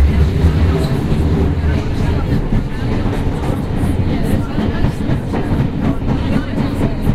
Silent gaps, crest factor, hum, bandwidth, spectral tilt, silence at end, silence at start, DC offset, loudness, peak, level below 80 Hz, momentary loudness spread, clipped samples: none; 14 dB; none; 13.5 kHz; -8 dB/octave; 0 s; 0 s; under 0.1%; -17 LUFS; -2 dBFS; -20 dBFS; 5 LU; under 0.1%